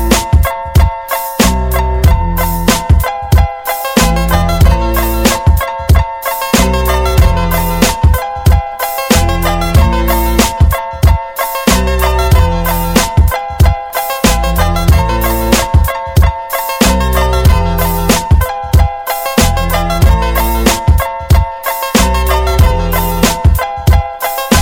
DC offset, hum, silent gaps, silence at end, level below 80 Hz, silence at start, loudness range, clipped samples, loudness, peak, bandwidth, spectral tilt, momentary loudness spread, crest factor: under 0.1%; none; none; 0 s; -14 dBFS; 0 s; 1 LU; 0.4%; -12 LUFS; 0 dBFS; 18 kHz; -5 dB/octave; 4 LU; 10 dB